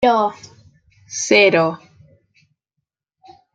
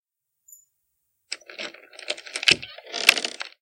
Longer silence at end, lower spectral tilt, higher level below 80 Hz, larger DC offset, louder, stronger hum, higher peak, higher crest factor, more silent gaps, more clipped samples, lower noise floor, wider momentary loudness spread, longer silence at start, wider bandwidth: first, 1.8 s vs 0.15 s; first, -3 dB/octave vs 0 dB/octave; first, -60 dBFS vs -66 dBFS; neither; first, -16 LUFS vs -22 LUFS; neither; about the same, -2 dBFS vs 0 dBFS; second, 18 dB vs 28 dB; neither; neither; first, -79 dBFS vs -75 dBFS; about the same, 17 LU vs 18 LU; second, 0 s vs 1.3 s; second, 9.4 kHz vs 17 kHz